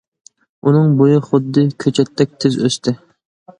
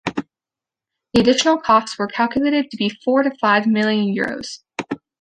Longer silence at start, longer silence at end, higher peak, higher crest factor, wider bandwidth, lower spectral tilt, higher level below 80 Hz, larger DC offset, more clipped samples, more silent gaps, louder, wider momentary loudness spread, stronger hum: first, 0.65 s vs 0.05 s; first, 0.65 s vs 0.25 s; about the same, 0 dBFS vs -2 dBFS; about the same, 16 dB vs 18 dB; about the same, 10.5 kHz vs 10.5 kHz; first, -7 dB/octave vs -4.5 dB/octave; about the same, -58 dBFS vs -54 dBFS; neither; neither; neither; first, -15 LUFS vs -18 LUFS; second, 8 LU vs 14 LU; neither